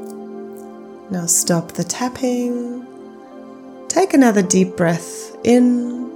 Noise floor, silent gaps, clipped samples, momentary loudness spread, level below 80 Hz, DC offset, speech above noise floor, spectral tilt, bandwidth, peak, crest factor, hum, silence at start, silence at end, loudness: -37 dBFS; none; under 0.1%; 24 LU; -64 dBFS; under 0.1%; 21 dB; -4.5 dB/octave; 18 kHz; -2 dBFS; 18 dB; none; 0 s; 0 s; -17 LUFS